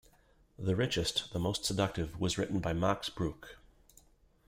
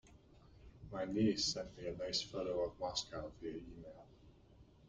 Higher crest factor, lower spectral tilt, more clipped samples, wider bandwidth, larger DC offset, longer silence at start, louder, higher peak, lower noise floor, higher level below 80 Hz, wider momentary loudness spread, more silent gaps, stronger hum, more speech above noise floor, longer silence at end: about the same, 20 dB vs 20 dB; about the same, -4.5 dB/octave vs -4 dB/octave; neither; first, 16 kHz vs 9.6 kHz; neither; first, 0.6 s vs 0.05 s; first, -34 LUFS vs -40 LUFS; first, -16 dBFS vs -24 dBFS; about the same, -66 dBFS vs -64 dBFS; first, -54 dBFS vs -62 dBFS; second, 7 LU vs 20 LU; neither; neither; first, 32 dB vs 23 dB; first, 0.9 s vs 0 s